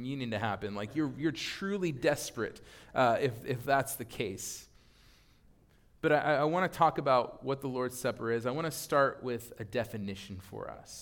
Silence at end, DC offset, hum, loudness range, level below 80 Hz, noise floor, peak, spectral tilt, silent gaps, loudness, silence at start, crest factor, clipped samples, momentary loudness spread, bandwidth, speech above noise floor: 0 s; under 0.1%; none; 3 LU; -62 dBFS; -63 dBFS; -12 dBFS; -5 dB/octave; none; -32 LUFS; 0 s; 22 dB; under 0.1%; 12 LU; 18 kHz; 31 dB